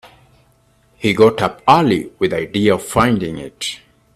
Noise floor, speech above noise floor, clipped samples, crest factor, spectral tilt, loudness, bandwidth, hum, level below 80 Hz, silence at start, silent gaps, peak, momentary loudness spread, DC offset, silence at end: -55 dBFS; 40 dB; under 0.1%; 18 dB; -5.5 dB/octave; -16 LUFS; 14.5 kHz; none; -46 dBFS; 1 s; none; 0 dBFS; 12 LU; under 0.1%; 0.4 s